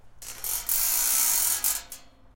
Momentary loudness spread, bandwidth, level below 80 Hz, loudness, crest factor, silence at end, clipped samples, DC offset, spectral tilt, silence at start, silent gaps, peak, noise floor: 15 LU; 17.5 kHz; -52 dBFS; -23 LUFS; 20 dB; 0.25 s; under 0.1%; under 0.1%; 2 dB/octave; 0.05 s; none; -6 dBFS; -47 dBFS